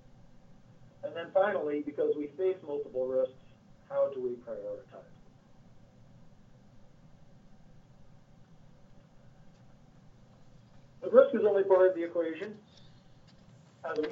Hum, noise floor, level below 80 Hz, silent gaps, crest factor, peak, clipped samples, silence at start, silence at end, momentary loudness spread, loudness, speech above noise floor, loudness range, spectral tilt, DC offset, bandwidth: none; -57 dBFS; -66 dBFS; none; 26 dB; -8 dBFS; under 0.1%; 0.5 s; 0 s; 20 LU; -30 LUFS; 28 dB; 12 LU; -7.5 dB/octave; under 0.1%; 6.2 kHz